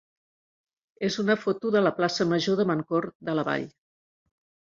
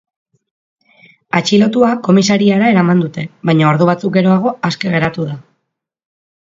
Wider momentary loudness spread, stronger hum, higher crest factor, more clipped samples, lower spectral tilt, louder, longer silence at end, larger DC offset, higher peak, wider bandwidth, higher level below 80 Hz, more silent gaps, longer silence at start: about the same, 7 LU vs 9 LU; neither; first, 20 dB vs 14 dB; neither; about the same, -5.5 dB/octave vs -6 dB/octave; second, -26 LUFS vs -13 LUFS; about the same, 1.1 s vs 1.1 s; neither; second, -8 dBFS vs 0 dBFS; about the same, 7.6 kHz vs 7.6 kHz; second, -70 dBFS vs -54 dBFS; first, 3.15-3.20 s vs none; second, 1 s vs 1.35 s